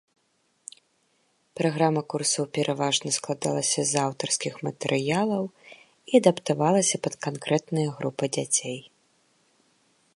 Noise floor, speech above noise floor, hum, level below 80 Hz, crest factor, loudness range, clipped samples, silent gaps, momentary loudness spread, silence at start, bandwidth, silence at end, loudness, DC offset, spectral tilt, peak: -70 dBFS; 45 dB; none; -72 dBFS; 24 dB; 3 LU; under 0.1%; none; 12 LU; 1.55 s; 11.5 kHz; 1.3 s; -25 LUFS; under 0.1%; -4 dB/octave; -4 dBFS